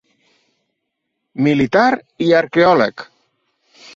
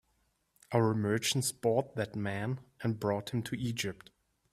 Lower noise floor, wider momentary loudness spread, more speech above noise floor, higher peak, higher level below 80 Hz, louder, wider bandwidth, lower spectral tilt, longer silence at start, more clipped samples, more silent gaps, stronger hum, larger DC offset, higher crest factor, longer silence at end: about the same, -75 dBFS vs -75 dBFS; first, 10 LU vs 7 LU; first, 61 dB vs 43 dB; first, -2 dBFS vs -14 dBFS; first, -56 dBFS vs -66 dBFS; first, -15 LUFS vs -33 LUFS; second, 7.6 kHz vs 15.5 kHz; first, -6.5 dB/octave vs -5 dB/octave; first, 1.35 s vs 0.7 s; neither; neither; neither; neither; about the same, 16 dB vs 20 dB; first, 0.9 s vs 0.6 s